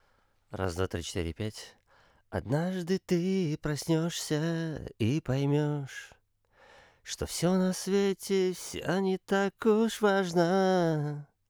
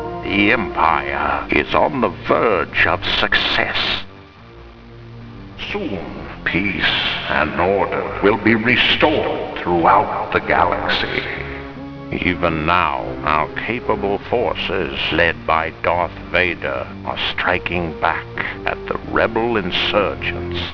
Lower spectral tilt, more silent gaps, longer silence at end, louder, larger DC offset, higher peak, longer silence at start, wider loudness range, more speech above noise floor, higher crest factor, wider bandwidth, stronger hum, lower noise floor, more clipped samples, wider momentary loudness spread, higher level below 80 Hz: about the same, -5.5 dB/octave vs -6.5 dB/octave; neither; first, 0.25 s vs 0 s; second, -30 LUFS vs -18 LUFS; neither; second, -12 dBFS vs 0 dBFS; first, 0.5 s vs 0 s; about the same, 5 LU vs 5 LU; first, 39 dB vs 22 dB; about the same, 18 dB vs 18 dB; first, over 20 kHz vs 5.4 kHz; neither; first, -68 dBFS vs -40 dBFS; neither; about the same, 12 LU vs 10 LU; second, -56 dBFS vs -38 dBFS